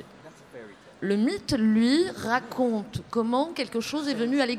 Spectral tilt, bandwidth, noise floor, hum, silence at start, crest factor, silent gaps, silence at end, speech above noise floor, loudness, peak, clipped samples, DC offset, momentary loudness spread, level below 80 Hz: -5 dB/octave; 14 kHz; -49 dBFS; none; 0 s; 16 dB; none; 0 s; 24 dB; -26 LUFS; -10 dBFS; under 0.1%; under 0.1%; 15 LU; -58 dBFS